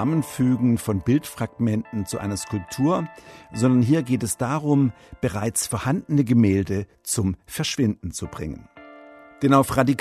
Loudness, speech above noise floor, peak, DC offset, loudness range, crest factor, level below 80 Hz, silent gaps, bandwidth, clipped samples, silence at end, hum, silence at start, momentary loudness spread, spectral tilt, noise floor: -23 LUFS; 23 dB; -4 dBFS; under 0.1%; 3 LU; 20 dB; -50 dBFS; none; 14 kHz; under 0.1%; 0 s; none; 0 s; 12 LU; -6 dB/octave; -45 dBFS